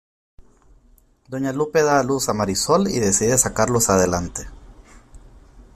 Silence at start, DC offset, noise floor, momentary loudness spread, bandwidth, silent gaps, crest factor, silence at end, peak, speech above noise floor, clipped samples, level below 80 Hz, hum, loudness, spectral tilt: 0.4 s; under 0.1%; -55 dBFS; 13 LU; 16 kHz; none; 20 dB; 0.15 s; -2 dBFS; 36 dB; under 0.1%; -44 dBFS; none; -19 LUFS; -4 dB/octave